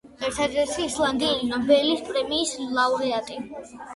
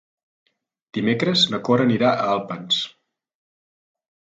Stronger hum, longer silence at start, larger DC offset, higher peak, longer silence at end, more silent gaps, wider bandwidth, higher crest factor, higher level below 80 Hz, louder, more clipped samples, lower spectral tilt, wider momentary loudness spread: neither; second, 0.05 s vs 0.95 s; neither; second, -8 dBFS vs -4 dBFS; second, 0 s vs 1.45 s; neither; first, 11.5 kHz vs 9 kHz; about the same, 18 dB vs 20 dB; first, -54 dBFS vs -66 dBFS; second, -24 LUFS vs -20 LUFS; neither; second, -2.5 dB/octave vs -5 dB/octave; first, 12 LU vs 8 LU